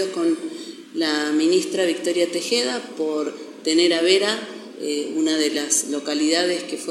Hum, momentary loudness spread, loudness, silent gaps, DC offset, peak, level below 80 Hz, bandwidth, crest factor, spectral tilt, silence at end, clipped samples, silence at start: none; 10 LU; -21 LUFS; none; under 0.1%; -4 dBFS; -88 dBFS; 14 kHz; 18 dB; -2 dB/octave; 0 s; under 0.1%; 0 s